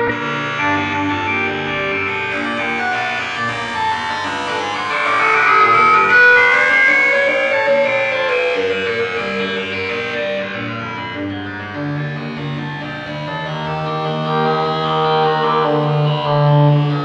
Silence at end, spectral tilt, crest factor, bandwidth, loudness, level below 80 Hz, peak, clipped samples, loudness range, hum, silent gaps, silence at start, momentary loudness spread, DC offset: 0 s; -5.5 dB/octave; 14 dB; 9.4 kHz; -16 LUFS; -54 dBFS; -2 dBFS; under 0.1%; 12 LU; none; none; 0 s; 14 LU; under 0.1%